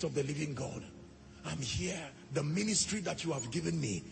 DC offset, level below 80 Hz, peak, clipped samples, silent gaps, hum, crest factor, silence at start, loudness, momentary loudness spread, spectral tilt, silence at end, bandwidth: under 0.1%; -60 dBFS; -18 dBFS; under 0.1%; none; none; 18 dB; 0 s; -36 LUFS; 16 LU; -4 dB/octave; 0 s; 8.8 kHz